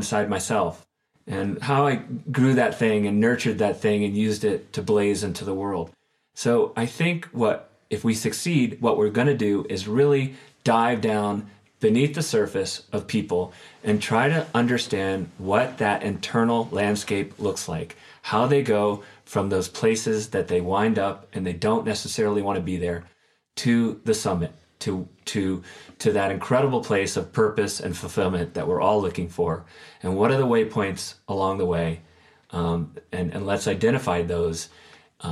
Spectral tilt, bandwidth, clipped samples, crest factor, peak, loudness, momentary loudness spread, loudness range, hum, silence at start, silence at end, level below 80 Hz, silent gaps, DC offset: -5.5 dB/octave; 14 kHz; under 0.1%; 20 dB; -4 dBFS; -24 LUFS; 9 LU; 3 LU; none; 0 s; 0 s; -54 dBFS; none; under 0.1%